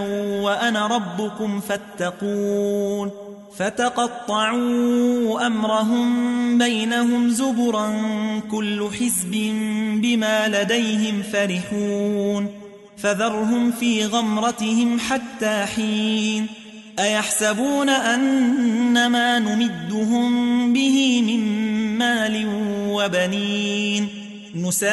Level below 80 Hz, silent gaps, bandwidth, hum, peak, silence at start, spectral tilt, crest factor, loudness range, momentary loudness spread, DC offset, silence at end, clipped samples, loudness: -62 dBFS; none; 12 kHz; none; -6 dBFS; 0 s; -4 dB/octave; 14 dB; 3 LU; 7 LU; under 0.1%; 0 s; under 0.1%; -21 LUFS